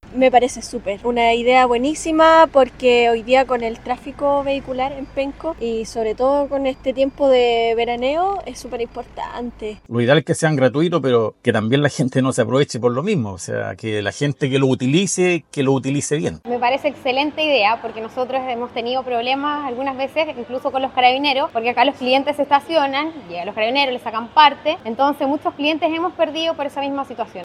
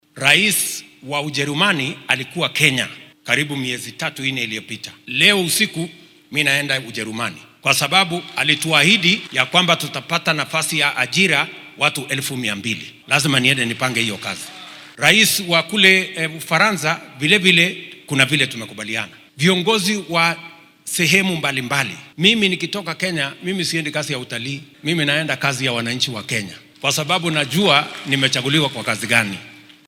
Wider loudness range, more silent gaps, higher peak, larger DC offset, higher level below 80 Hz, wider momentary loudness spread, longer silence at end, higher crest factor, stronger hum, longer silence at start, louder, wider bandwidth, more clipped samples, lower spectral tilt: about the same, 5 LU vs 5 LU; neither; about the same, 0 dBFS vs 0 dBFS; neither; first, -48 dBFS vs -60 dBFS; about the same, 11 LU vs 13 LU; second, 0 s vs 0.3 s; about the same, 18 dB vs 20 dB; neither; about the same, 0.05 s vs 0.15 s; about the same, -18 LUFS vs -17 LUFS; second, 12.5 kHz vs 17.5 kHz; neither; first, -5 dB/octave vs -3 dB/octave